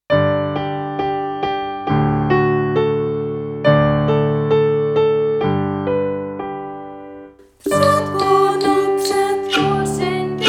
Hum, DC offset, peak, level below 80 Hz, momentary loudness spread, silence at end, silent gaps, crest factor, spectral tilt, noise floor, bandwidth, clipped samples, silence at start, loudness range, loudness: none; under 0.1%; -2 dBFS; -46 dBFS; 10 LU; 0 s; none; 16 dB; -6 dB/octave; -40 dBFS; 16.5 kHz; under 0.1%; 0.1 s; 3 LU; -17 LUFS